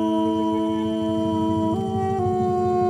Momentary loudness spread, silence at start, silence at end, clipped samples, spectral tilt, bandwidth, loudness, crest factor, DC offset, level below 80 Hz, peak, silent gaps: 2 LU; 0 s; 0 s; under 0.1%; -8 dB/octave; 10.5 kHz; -23 LUFS; 12 dB; under 0.1%; -52 dBFS; -10 dBFS; none